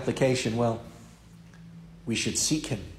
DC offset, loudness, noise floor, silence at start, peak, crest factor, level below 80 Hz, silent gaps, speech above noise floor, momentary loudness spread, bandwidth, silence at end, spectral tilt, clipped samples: under 0.1%; -27 LUFS; -50 dBFS; 0 s; -12 dBFS; 18 dB; -52 dBFS; none; 23 dB; 23 LU; 16 kHz; 0 s; -4 dB/octave; under 0.1%